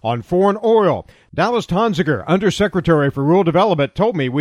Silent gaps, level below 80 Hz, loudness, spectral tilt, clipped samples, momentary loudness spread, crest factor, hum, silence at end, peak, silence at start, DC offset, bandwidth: none; -44 dBFS; -16 LUFS; -7 dB/octave; under 0.1%; 5 LU; 16 dB; none; 0 s; 0 dBFS; 0.05 s; under 0.1%; 12 kHz